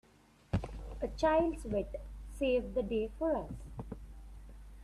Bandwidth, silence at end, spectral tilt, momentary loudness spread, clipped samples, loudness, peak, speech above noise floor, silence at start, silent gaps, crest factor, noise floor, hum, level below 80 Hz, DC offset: 13 kHz; 0 s; -7 dB/octave; 22 LU; under 0.1%; -35 LUFS; -18 dBFS; 30 dB; 0.55 s; none; 18 dB; -64 dBFS; none; -48 dBFS; under 0.1%